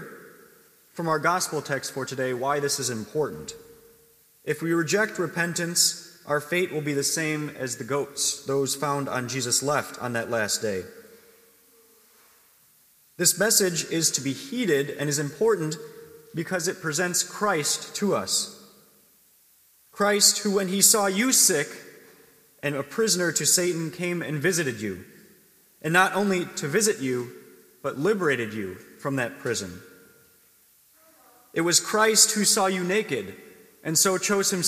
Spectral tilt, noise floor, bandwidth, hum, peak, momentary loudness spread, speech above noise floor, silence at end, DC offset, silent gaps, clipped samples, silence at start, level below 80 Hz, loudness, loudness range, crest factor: -2.5 dB/octave; -60 dBFS; 15.5 kHz; none; -2 dBFS; 15 LU; 35 dB; 0 s; under 0.1%; none; under 0.1%; 0 s; -72 dBFS; -24 LUFS; 8 LU; 24 dB